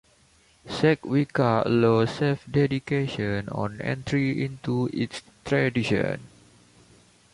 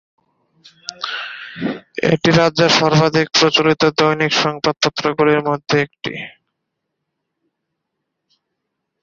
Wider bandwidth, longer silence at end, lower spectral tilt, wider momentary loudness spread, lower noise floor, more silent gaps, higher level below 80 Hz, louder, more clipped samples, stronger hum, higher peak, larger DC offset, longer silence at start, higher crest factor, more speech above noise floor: first, 11.5 kHz vs 7.6 kHz; second, 1.05 s vs 2.75 s; first, -7 dB/octave vs -4.5 dB/octave; second, 9 LU vs 14 LU; second, -60 dBFS vs -76 dBFS; neither; about the same, -54 dBFS vs -54 dBFS; second, -25 LUFS vs -16 LUFS; neither; neither; second, -8 dBFS vs 0 dBFS; neither; second, 0.65 s vs 0.9 s; about the same, 18 dB vs 18 dB; second, 35 dB vs 61 dB